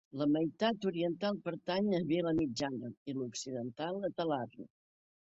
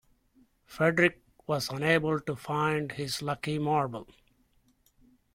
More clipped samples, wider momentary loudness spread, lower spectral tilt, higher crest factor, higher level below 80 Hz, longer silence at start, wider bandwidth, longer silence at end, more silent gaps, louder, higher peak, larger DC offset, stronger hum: neither; about the same, 9 LU vs 10 LU; about the same, -5.5 dB/octave vs -5.5 dB/octave; about the same, 18 dB vs 22 dB; about the same, -68 dBFS vs -64 dBFS; second, 0.15 s vs 0.7 s; second, 8 kHz vs 16.5 kHz; second, 0.7 s vs 1.3 s; first, 2.97-3.06 s vs none; second, -36 LUFS vs -29 LUFS; second, -18 dBFS vs -8 dBFS; neither; neither